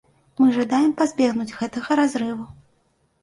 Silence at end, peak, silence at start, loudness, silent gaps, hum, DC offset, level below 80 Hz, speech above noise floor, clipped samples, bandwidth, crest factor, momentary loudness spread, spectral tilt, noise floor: 0.7 s; -8 dBFS; 0.4 s; -21 LUFS; none; none; under 0.1%; -60 dBFS; 45 dB; under 0.1%; 11.5 kHz; 14 dB; 13 LU; -5 dB/octave; -65 dBFS